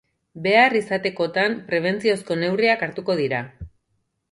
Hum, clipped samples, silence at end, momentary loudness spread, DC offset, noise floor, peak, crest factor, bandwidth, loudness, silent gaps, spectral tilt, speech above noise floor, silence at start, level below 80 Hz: none; under 0.1%; 0.65 s; 9 LU; under 0.1%; -72 dBFS; -2 dBFS; 20 dB; 11.5 kHz; -21 LUFS; none; -5.5 dB/octave; 51 dB; 0.35 s; -54 dBFS